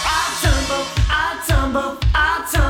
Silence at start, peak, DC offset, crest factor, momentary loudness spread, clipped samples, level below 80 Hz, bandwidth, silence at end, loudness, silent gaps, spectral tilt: 0 s; -2 dBFS; under 0.1%; 16 dB; 3 LU; under 0.1%; -22 dBFS; 18.5 kHz; 0 s; -18 LUFS; none; -4 dB/octave